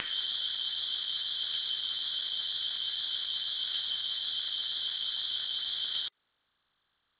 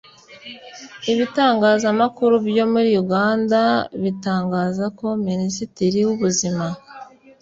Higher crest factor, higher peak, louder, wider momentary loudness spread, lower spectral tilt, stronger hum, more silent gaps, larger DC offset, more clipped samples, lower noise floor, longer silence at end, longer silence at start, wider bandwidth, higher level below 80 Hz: about the same, 20 dB vs 16 dB; second, -16 dBFS vs -4 dBFS; second, -30 LUFS vs -19 LUFS; second, 1 LU vs 15 LU; second, 4.5 dB/octave vs -5 dB/octave; neither; neither; neither; neither; first, -79 dBFS vs -41 dBFS; first, 1.1 s vs 0.35 s; second, 0 s vs 0.3 s; second, 4 kHz vs 7.8 kHz; second, -76 dBFS vs -58 dBFS